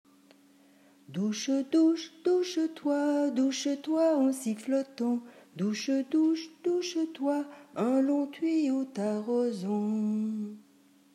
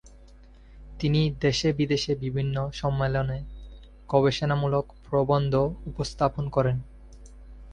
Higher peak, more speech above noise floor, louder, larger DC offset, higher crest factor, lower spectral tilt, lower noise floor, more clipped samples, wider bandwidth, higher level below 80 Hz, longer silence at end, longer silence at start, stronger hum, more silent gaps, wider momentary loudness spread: second, -16 dBFS vs -6 dBFS; first, 33 dB vs 25 dB; second, -30 LUFS vs -26 LUFS; neither; second, 14 dB vs 20 dB; about the same, -5.5 dB/octave vs -6.5 dB/octave; first, -61 dBFS vs -50 dBFS; neither; first, 13 kHz vs 9.8 kHz; second, -90 dBFS vs -44 dBFS; first, 0.55 s vs 0 s; first, 1.1 s vs 0.05 s; neither; neither; second, 7 LU vs 10 LU